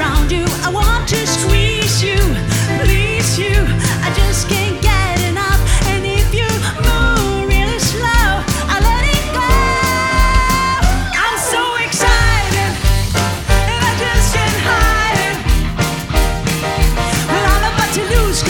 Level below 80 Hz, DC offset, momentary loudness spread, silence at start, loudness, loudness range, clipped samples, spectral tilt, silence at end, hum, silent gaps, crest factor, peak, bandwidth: -18 dBFS; under 0.1%; 3 LU; 0 s; -14 LUFS; 1 LU; under 0.1%; -4 dB/octave; 0 s; none; none; 14 dB; 0 dBFS; 19.5 kHz